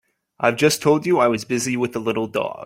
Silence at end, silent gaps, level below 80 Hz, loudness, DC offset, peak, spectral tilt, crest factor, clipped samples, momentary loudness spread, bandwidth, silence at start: 0 s; none; -60 dBFS; -20 LUFS; under 0.1%; -2 dBFS; -4.5 dB/octave; 18 dB; under 0.1%; 6 LU; 16.5 kHz; 0.4 s